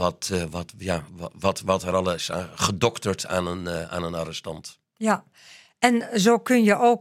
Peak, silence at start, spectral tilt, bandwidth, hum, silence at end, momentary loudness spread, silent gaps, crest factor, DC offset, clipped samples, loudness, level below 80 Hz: -2 dBFS; 0 s; -4.5 dB/octave; 16.5 kHz; none; 0 s; 13 LU; none; 24 dB; under 0.1%; under 0.1%; -24 LUFS; -58 dBFS